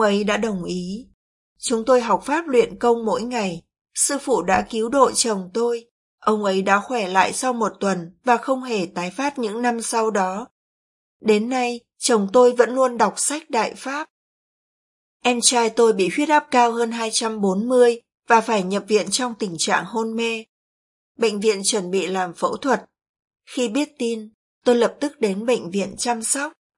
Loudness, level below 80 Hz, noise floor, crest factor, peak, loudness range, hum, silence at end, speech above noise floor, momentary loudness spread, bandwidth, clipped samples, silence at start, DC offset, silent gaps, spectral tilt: -20 LUFS; -60 dBFS; under -90 dBFS; 20 dB; 0 dBFS; 4 LU; none; 0.25 s; over 70 dB; 9 LU; 11.5 kHz; under 0.1%; 0 s; under 0.1%; 1.14-1.56 s, 3.81-3.85 s, 5.91-6.18 s, 10.51-11.20 s, 14.10-15.20 s, 20.49-21.15 s, 23.09-23.28 s, 24.34-24.62 s; -3.5 dB/octave